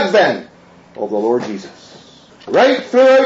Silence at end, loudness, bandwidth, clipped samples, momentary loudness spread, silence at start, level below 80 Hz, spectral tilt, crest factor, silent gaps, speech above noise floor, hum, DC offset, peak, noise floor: 0 s; -15 LUFS; 7.8 kHz; under 0.1%; 15 LU; 0 s; -64 dBFS; -4.5 dB/octave; 14 dB; none; 29 dB; none; under 0.1%; 0 dBFS; -42 dBFS